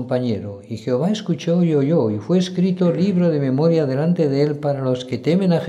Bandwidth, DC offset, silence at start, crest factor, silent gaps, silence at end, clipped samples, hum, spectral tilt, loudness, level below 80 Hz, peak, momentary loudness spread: 8.6 kHz; under 0.1%; 0 s; 12 dB; none; 0 s; under 0.1%; none; -8 dB/octave; -19 LUFS; -66 dBFS; -6 dBFS; 5 LU